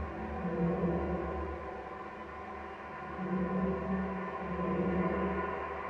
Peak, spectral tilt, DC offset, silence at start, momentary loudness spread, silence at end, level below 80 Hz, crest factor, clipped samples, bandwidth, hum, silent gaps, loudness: -20 dBFS; -9.5 dB/octave; under 0.1%; 0 s; 11 LU; 0 s; -48 dBFS; 14 dB; under 0.1%; 6.2 kHz; none; none; -36 LUFS